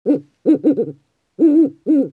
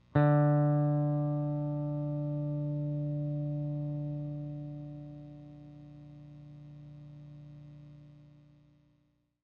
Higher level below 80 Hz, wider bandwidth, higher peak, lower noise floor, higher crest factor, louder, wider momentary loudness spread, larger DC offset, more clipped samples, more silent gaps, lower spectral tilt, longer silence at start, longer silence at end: second, -78 dBFS vs -62 dBFS; about the same, 4.2 kHz vs 4 kHz; first, -4 dBFS vs -14 dBFS; second, -40 dBFS vs -73 dBFS; second, 12 dB vs 20 dB; first, -16 LUFS vs -32 LUFS; second, 8 LU vs 24 LU; neither; neither; neither; second, -10 dB/octave vs -12 dB/octave; about the same, 0.05 s vs 0.15 s; second, 0.05 s vs 1.2 s